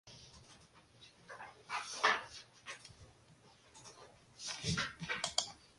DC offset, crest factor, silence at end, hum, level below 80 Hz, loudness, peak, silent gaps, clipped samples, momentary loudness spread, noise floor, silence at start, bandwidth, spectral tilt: under 0.1%; 30 dB; 0.1 s; none; -66 dBFS; -38 LUFS; -14 dBFS; none; under 0.1%; 26 LU; -64 dBFS; 0.05 s; 11.5 kHz; -2 dB/octave